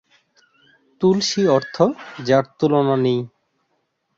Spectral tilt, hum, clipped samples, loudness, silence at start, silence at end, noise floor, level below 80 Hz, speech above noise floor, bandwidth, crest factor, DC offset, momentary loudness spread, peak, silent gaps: -5.5 dB/octave; none; under 0.1%; -19 LUFS; 1 s; 0.9 s; -70 dBFS; -62 dBFS; 52 dB; 7.8 kHz; 18 dB; under 0.1%; 6 LU; -2 dBFS; none